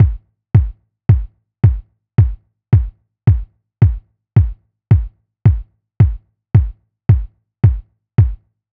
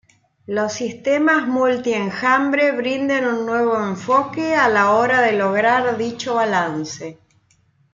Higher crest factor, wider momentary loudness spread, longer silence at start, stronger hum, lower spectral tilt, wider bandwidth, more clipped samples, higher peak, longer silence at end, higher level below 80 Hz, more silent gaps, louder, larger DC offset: about the same, 16 dB vs 16 dB; first, 13 LU vs 9 LU; second, 0 s vs 0.5 s; neither; first, -12 dB/octave vs -4.5 dB/octave; second, 3.2 kHz vs 7.6 kHz; neither; about the same, 0 dBFS vs -2 dBFS; second, 0.35 s vs 0.8 s; first, -24 dBFS vs -62 dBFS; neither; about the same, -16 LUFS vs -18 LUFS; neither